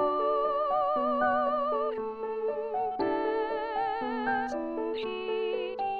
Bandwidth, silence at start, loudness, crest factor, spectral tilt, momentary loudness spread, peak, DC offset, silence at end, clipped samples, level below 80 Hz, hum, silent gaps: 7 kHz; 0 s; -30 LUFS; 14 dB; -5.5 dB/octave; 6 LU; -16 dBFS; 0.1%; 0 s; under 0.1%; -60 dBFS; none; none